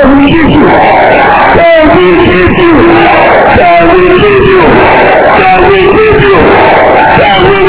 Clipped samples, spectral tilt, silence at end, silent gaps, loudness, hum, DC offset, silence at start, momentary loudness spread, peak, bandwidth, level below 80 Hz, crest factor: 30%; -9.5 dB/octave; 0 s; none; -3 LUFS; none; 3%; 0 s; 1 LU; 0 dBFS; 4 kHz; -22 dBFS; 2 dB